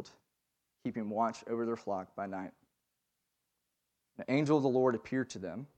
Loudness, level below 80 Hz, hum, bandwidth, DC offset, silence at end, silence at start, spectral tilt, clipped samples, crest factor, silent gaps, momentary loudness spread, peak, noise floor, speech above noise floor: -34 LUFS; -78 dBFS; 60 Hz at -80 dBFS; 9.2 kHz; under 0.1%; 0.1 s; 0 s; -7 dB/octave; under 0.1%; 20 dB; none; 15 LU; -16 dBFS; -84 dBFS; 51 dB